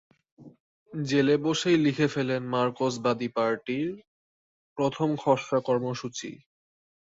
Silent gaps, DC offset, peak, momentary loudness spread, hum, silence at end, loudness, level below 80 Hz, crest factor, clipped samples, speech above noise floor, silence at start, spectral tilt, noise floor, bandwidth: 0.60-0.86 s, 4.07-4.76 s; under 0.1%; -8 dBFS; 13 LU; none; 0.8 s; -27 LUFS; -68 dBFS; 20 dB; under 0.1%; over 64 dB; 0.4 s; -5.5 dB/octave; under -90 dBFS; 8 kHz